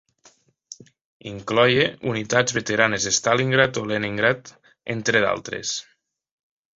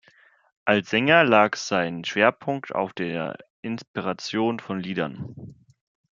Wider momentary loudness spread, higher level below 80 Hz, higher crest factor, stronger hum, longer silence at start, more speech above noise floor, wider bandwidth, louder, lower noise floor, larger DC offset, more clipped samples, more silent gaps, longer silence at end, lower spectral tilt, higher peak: first, 19 LU vs 16 LU; first, -58 dBFS vs -66 dBFS; about the same, 22 dB vs 24 dB; neither; about the same, 0.7 s vs 0.65 s; about the same, 36 dB vs 34 dB; about the same, 8 kHz vs 7.4 kHz; about the same, -21 LUFS vs -23 LUFS; about the same, -57 dBFS vs -58 dBFS; neither; neither; about the same, 1.01-1.20 s vs 3.50-3.63 s, 3.88-3.94 s; first, 0.95 s vs 0.6 s; second, -3.5 dB/octave vs -5 dB/octave; about the same, -2 dBFS vs -2 dBFS